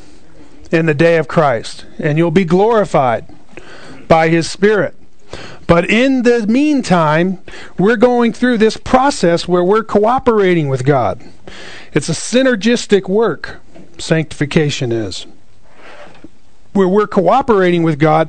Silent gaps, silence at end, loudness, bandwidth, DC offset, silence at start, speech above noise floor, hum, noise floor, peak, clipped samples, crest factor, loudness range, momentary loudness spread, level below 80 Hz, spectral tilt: none; 0 s; -13 LUFS; 9.4 kHz; 3%; 0.7 s; 34 dB; none; -46 dBFS; 0 dBFS; under 0.1%; 14 dB; 5 LU; 11 LU; -42 dBFS; -6 dB/octave